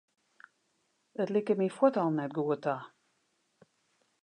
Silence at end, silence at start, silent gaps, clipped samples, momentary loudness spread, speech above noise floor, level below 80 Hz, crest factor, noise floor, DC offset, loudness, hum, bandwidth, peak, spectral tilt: 1.35 s; 1.2 s; none; under 0.1%; 10 LU; 46 dB; -88 dBFS; 22 dB; -76 dBFS; under 0.1%; -31 LUFS; none; 10 kHz; -10 dBFS; -8 dB/octave